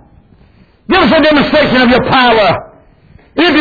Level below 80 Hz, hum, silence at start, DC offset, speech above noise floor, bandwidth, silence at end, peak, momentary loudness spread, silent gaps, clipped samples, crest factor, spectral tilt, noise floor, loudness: -36 dBFS; none; 0.9 s; under 0.1%; 37 dB; 5 kHz; 0 s; 0 dBFS; 6 LU; none; under 0.1%; 10 dB; -6.5 dB/octave; -45 dBFS; -9 LUFS